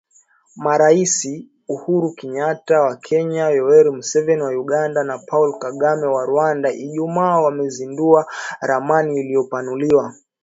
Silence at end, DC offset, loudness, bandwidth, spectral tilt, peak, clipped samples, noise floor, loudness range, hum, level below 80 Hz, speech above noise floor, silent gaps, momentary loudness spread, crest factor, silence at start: 0.3 s; under 0.1%; -18 LUFS; 8 kHz; -5 dB/octave; 0 dBFS; under 0.1%; -55 dBFS; 2 LU; none; -66 dBFS; 38 dB; none; 11 LU; 18 dB; 0.55 s